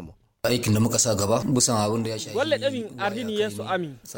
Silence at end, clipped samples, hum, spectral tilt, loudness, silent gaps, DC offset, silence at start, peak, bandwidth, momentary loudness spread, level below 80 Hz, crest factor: 0 s; under 0.1%; none; -4 dB/octave; -24 LUFS; none; under 0.1%; 0 s; -8 dBFS; 17 kHz; 8 LU; -54 dBFS; 16 dB